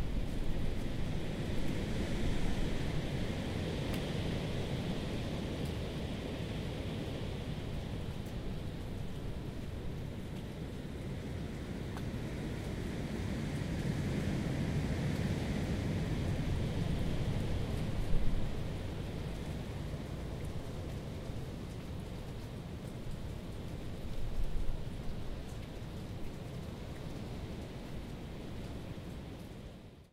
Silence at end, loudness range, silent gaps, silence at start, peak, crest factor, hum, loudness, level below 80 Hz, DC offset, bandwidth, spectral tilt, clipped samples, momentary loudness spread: 0.05 s; 8 LU; none; 0 s; -18 dBFS; 20 dB; none; -40 LUFS; -42 dBFS; under 0.1%; 15.5 kHz; -6.5 dB/octave; under 0.1%; 9 LU